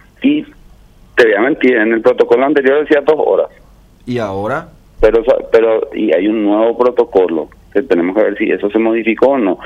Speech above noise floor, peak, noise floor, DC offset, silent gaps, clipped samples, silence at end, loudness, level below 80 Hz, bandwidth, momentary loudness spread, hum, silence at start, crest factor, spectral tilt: 30 dB; 0 dBFS; -42 dBFS; under 0.1%; none; under 0.1%; 0 s; -13 LUFS; -38 dBFS; 7.6 kHz; 9 LU; none; 0.2 s; 12 dB; -7 dB/octave